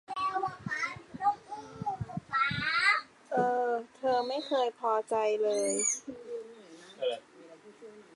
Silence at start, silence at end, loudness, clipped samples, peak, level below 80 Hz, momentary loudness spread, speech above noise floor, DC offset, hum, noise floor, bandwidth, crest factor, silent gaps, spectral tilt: 0.1 s; 0.15 s; -31 LUFS; under 0.1%; -14 dBFS; -66 dBFS; 15 LU; 23 dB; under 0.1%; none; -54 dBFS; 11.5 kHz; 18 dB; none; -2.5 dB/octave